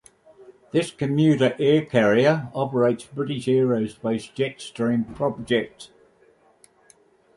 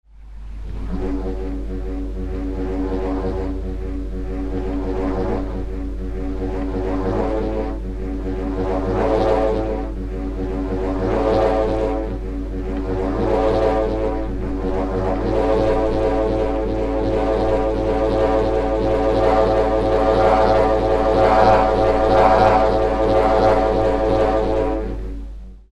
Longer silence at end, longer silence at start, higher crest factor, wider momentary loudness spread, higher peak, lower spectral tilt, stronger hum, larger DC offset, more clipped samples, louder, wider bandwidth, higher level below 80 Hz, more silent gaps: first, 1.5 s vs 0.15 s; first, 0.4 s vs 0.2 s; about the same, 18 dB vs 18 dB; second, 9 LU vs 13 LU; second, -4 dBFS vs 0 dBFS; about the same, -6.5 dB/octave vs -7.5 dB/octave; neither; neither; neither; about the same, -22 LUFS vs -20 LUFS; first, 11.5 kHz vs 9.4 kHz; second, -60 dBFS vs -26 dBFS; neither